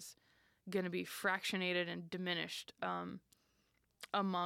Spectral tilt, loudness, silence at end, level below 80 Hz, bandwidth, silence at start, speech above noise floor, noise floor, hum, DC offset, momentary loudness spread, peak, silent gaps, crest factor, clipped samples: -4 dB/octave; -40 LUFS; 0 s; -82 dBFS; 16.5 kHz; 0 s; 39 dB; -78 dBFS; none; under 0.1%; 16 LU; -24 dBFS; none; 18 dB; under 0.1%